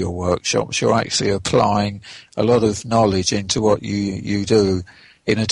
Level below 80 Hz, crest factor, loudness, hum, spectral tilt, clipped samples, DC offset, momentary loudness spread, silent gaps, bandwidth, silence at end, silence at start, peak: -44 dBFS; 16 dB; -19 LUFS; none; -4.5 dB/octave; under 0.1%; under 0.1%; 7 LU; none; 11.5 kHz; 0 s; 0 s; -4 dBFS